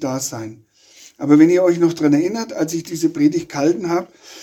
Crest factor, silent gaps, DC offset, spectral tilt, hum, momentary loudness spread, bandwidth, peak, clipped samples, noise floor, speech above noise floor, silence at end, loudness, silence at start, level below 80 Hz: 16 dB; none; under 0.1%; -5.5 dB/octave; none; 14 LU; 16 kHz; 0 dBFS; under 0.1%; -47 dBFS; 30 dB; 0 s; -17 LUFS; 0 s; -62 dBFS